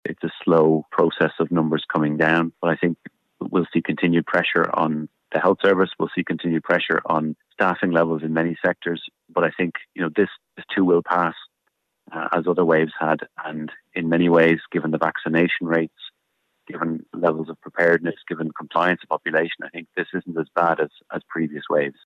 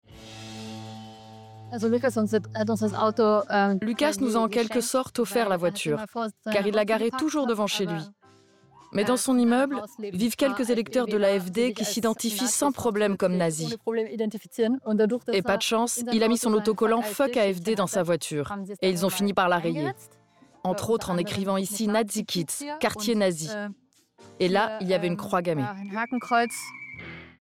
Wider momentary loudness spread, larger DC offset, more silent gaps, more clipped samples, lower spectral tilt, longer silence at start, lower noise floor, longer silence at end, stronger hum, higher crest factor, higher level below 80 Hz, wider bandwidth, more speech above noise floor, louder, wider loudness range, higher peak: about the same, 11 LU vs 11 LU; neither; neither; neither; first, -8 dB/octave vs -4.5 dB/octave; about the same, 0.05 s vs 0.1 s; first, -74 dBFS vs -57 dBFS; about the same, 0.15 s vs 0.15 s; neither; about the same, 16 dB vs 16 dB; about the same, -64 dBFS vs -64 dBFS; second, 6.8 kHz vs 17.5 kHz; first, 53 dB vs 32 dB; first, -22 LUFS vs -26 LUFS; about the same, 3 LU vs 3 LU; first, -6 dBFS vs -10 dBFS